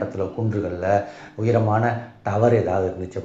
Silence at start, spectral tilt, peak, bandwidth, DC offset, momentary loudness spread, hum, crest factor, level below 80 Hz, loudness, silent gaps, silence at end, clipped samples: 0 s; -8.5 dB/octave; -6 dBFS; 7.6 kHz; under 0.1%; 8 LU; none; 16 dB; -54 dBFS; -22 LUFS; none; 0 s; under 0.1%